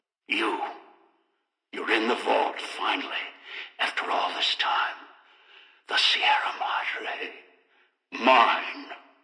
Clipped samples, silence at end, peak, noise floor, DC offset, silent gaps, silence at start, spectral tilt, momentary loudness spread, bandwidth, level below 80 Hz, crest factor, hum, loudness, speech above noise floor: under 0.1%; 0.25 s; -8 dBFS; -77 dBFS; under 0.1%; none; 0.3 s; -1 dB/octave; 18 LU; 10.5 kHz; under -90 dBFS; 20 dB; none; -25 LUFS; 50 dB